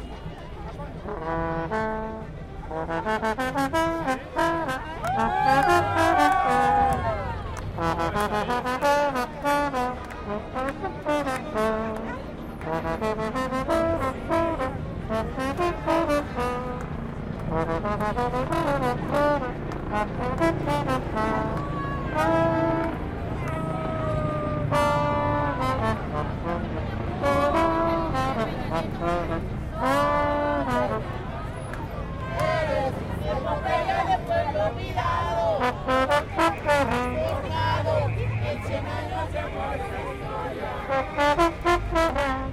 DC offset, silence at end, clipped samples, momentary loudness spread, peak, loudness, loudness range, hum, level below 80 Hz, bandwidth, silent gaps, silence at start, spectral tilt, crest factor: under 0.1%; 0 s; under 0.1%; 10 LU; -6 dBFS; -26 LUFS; 5 LU; none; -38 dBFS; 16 kHz; none; 0 s; -6 dB/octave; 20 dB